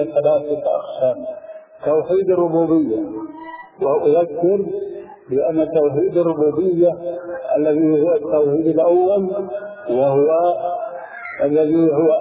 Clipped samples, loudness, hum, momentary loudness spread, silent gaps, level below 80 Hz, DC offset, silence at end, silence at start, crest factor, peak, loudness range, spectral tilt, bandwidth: under 0.1%; -18 LUFS; none; 14 LU; none; -60 dBFS; under 0.1%; 0 s; 0 s; 12 dB; -6 dBFS; 3 LU; -12 dB/octave; 4 kHz